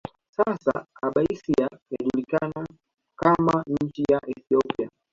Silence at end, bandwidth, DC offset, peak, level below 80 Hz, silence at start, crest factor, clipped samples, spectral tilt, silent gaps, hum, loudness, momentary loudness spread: 0.25 s; 7.6 kHz; under 0.1%; -6 dBFS; -56 dBFS; 0.4 s; 20 dB; under 0.1%; -8 dB/octave; 1.82-1.86 s; none; -25 LUFS; 9 LU